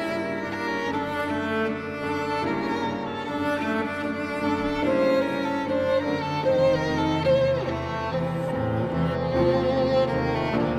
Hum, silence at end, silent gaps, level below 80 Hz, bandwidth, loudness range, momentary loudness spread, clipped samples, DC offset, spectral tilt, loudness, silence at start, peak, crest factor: none; 0 s; none; -46 dBFS; 13.5 kHz; 4 LU; 7 LU; under 0.1%; under 0.1%; -7 dB/octave; -25 LUFS; 0 s; -10 dBFS; 14 dB